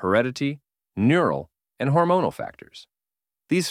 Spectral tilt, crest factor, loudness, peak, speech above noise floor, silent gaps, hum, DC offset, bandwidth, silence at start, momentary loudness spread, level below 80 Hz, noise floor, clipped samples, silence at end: -6 dB/octave; 16 dB; -23 LUFS; -6 dBFS; over 68 dB; none; none; under 0.1%; 15 kHz; 0 s; 17 LU; -60 dBFS; under -90 dBFS; under 0.1%; 0 s